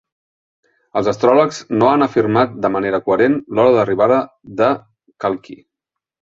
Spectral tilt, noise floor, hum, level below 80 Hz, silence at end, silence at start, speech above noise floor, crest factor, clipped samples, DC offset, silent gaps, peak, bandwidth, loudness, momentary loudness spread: -6.5 dB/octave; -83 dBFS; none; -56 dBFS; 0.85 s; 0.95 s; 68 dB; 16 dB; under 0.1%; under 0.1%; none; -2 dBFS; 7.8 kHz; -16 LUFS; 10 LU